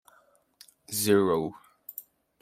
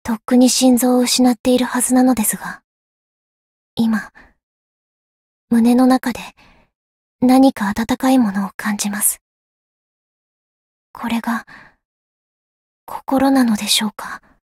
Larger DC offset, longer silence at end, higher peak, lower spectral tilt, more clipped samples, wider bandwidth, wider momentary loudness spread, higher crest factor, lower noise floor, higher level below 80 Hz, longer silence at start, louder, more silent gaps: neither; about the same, 0.4 s vs 0.3 s; second, -10 dBFS vs -2 dBFS; about the same, -4.5 dB/octave vs -3.5 dB/octave; neither; about the same, 16 kHz vs 16 kHz; about the same, 20 LU vs 18 LU; first, 22 dB vs 16 dB; second, -64 dBFS vs under -90 dBFS; second, -68 dBFS vs -52 dBFS; first, 0.9 s vs 0.05 s; second, -26 LUFS vs -16 LUFS; second, none vs 1.40-1.44 s, 2.64-3.77 s, 4.43-5.48 s, 6.75-7.19 s, 8.54-8.59 s, 9.21-10.94 s, 11.85-12.87 s